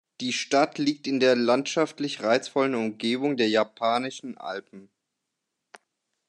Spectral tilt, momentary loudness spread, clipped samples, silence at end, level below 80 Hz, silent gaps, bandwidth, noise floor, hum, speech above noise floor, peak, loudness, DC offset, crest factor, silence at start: -4 dB/octave; 12 LU; under 0.1%; 1.45 s; -82 dBFS; none; 10.5 kHz; -82 dBFS; none; 57 dB; -8 dBFS; -25 LUFS; under 0.1%; 20 dB; 0.2 s